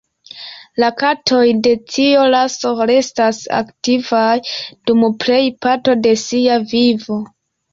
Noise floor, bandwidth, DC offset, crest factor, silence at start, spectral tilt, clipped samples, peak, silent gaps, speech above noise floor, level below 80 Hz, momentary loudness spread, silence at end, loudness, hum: -35 dBFS; 7.6 kHz; under 0.1%; 12 dB; 0.35 s; -4 dB/octave; under 0.1%; -2 dBFS; none; 21 dB; -56 dBFS; 11 LU; 0.45 s; -15 LUFS; none